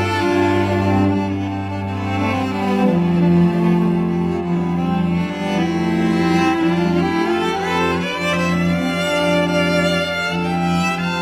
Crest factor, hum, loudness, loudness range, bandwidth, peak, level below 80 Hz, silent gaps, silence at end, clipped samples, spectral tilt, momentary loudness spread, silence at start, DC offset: 14 dB; none; -18 LUFS; 1 LU; 13 kHz; -4 dBFS; -46 dBFS; none; 0 s; under 0.1%; -6.5 dB/octave; 4 LU; 0 s; under 0.1%